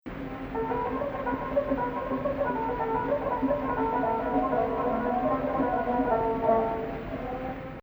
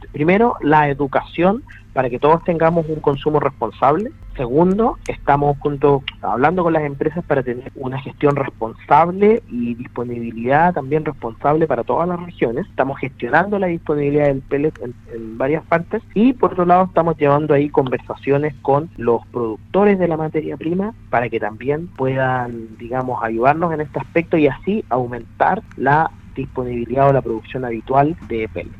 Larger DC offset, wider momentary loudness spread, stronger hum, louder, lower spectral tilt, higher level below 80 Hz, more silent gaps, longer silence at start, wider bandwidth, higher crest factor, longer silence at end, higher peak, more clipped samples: neither; about the same, 8 LU vs 10 LU; neither; second, -29 LUFS vs -18 LUFS; about the same, -9 dB/octave vs -9 dB/octave; about the same, -46 dBFS vs -42 dBFS; neither; about the same, 0.05 s vs 0 s; first, over 20 kHz vs 7.2 kHz; about the same, 16 dB vs 18 dB; about the same, 0 s vs 0 s; second, -12 dBFS vs 0 dBFS; neither